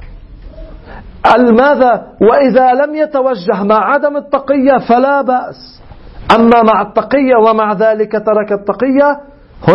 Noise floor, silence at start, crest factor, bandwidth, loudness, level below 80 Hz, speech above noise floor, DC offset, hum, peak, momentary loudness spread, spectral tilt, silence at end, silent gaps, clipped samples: -31 dBFS; 0 s; 10 dB; 8.4 kHz; -10 LUFS; -38 dBFS; 21 dB; under 0.1%; none; 0 dBFS; 7 LU; -7.5 dB/octave; 0 s; none; 0.2%